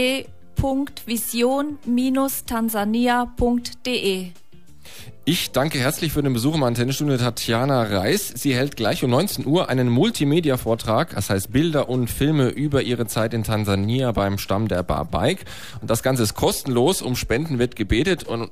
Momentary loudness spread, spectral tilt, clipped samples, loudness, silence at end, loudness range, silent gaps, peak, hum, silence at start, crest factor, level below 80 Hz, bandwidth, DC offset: 5 LU; -5 dB/octave; under 0.1%; -21 LUFS; 0.05 s; 3 LU; none; -8 dBFS; none; 0 s; 14 dB; -40 dBFS; 15.5 kHz; 1%